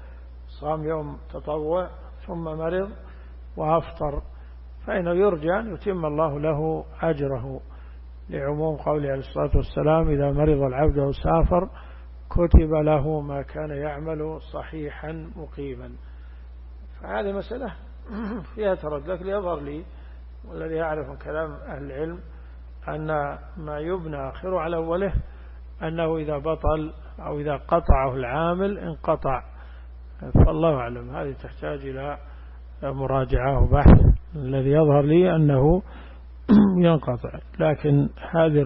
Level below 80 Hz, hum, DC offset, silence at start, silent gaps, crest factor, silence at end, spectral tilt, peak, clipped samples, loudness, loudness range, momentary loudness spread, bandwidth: -30 dBFS; none; under 0.1%; 0 s; none; 18 dB; 0 s; -12.5 dB/octave; -6 dBFS; under 0.1%; -24 LUFS; 12 LU; 24 LU; 5.4 kHz